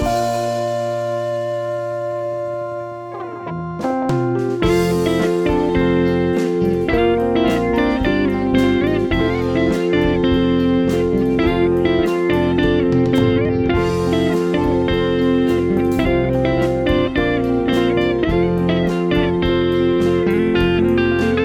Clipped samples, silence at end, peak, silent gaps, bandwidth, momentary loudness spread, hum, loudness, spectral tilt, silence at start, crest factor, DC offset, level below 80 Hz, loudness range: under 0.1%; 0 s; -4 dBFS; none; 15 kHz; 7 LU; none; -17 LUFS; -7 dB/octave; 0 s; 14 dB; under 0.1%; -32 dBFS; 5 LU